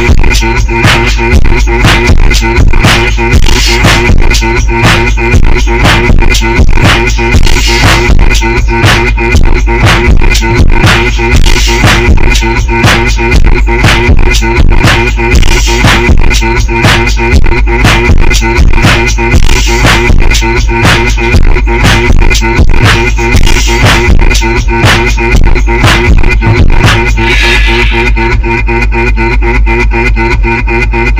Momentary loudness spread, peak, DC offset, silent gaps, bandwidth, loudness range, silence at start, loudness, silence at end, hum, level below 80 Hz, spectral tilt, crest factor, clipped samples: 3 LU; 0 dBFS; under 0.1%; none; 16 kHz; 0 LU; 0 s; -6 LUFS; 0 s; none; -6 dBFS; -4.5 dB/octave; 4 dB; 10%